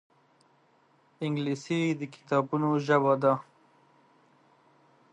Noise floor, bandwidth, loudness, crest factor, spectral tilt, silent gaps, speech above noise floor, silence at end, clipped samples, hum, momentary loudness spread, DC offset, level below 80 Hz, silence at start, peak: -65 dBFS; 9.8 kHz; -28 LUFS; 20 dB; -7 dB/octave; none; 38 dB; 1.7 s; under 0.1%; none; 9 LU; under 0.1%; -80 dBFS; 1.2 s; -12 dBFS